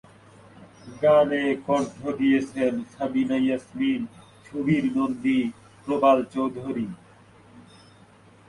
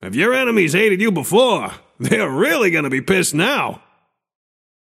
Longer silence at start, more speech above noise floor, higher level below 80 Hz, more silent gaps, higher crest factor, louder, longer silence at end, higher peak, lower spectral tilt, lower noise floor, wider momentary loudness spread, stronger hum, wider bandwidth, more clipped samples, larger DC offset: first, 0.6 s vs 0 s; second, 30 dB vs 46 dB; second, -62 dBFS vs -56 dBFS; neither; about the same, 18 dB vs 18 dB; second, -24 LUFS vs -16 LUFS; second, 0.9 s vs 1.05 s; second, -8 dBFS vs 0 dBFS; first, -7 dB/octave vs -4.5 dB/octave; second, -53 dBFS vs -62 dBFS; first, 12 LU vs 7 LU; neither; second, 11 kHz vs 16 kHz; neither; neither